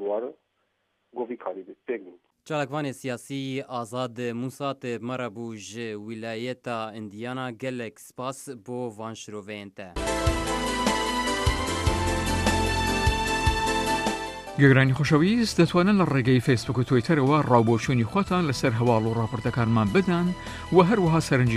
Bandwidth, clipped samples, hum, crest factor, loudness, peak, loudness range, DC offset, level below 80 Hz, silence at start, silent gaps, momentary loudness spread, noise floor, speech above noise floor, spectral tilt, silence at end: 14 kHz; under 0.1%; none; 20 dB; -25 LUFS; -6 dBFS; 12 LU; under 0.1%; -40 dBFS; 0 s; none; 15 LU; -73 dBFS; 49 dB; -5.5 dB/octave; 0 s